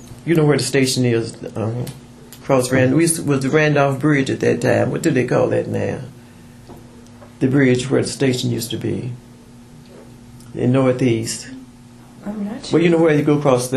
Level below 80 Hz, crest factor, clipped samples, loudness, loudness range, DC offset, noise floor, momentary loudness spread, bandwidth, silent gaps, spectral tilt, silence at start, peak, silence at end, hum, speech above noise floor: -50 dBFS; 18 dB; under 0.1%; -18 LUFS; 6 LU; under 0.1%; -42 dBFS; 14 LU; 14 kHz; none; -5.5 dB/octave; 0 s; 0 dBFS; 0 s; none; 25 dB